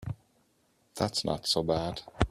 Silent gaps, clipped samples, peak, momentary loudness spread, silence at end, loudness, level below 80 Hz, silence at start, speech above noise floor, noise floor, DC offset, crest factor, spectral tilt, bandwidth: none; under 0.1%; -6 dBFS; 16 LU; 0 s; -31 LUFS; -48 dBFS; 0 s; 39 dB; -70 dBFS; under 0.1%; 26 dB; -4.5 dB/octave; 15 kHz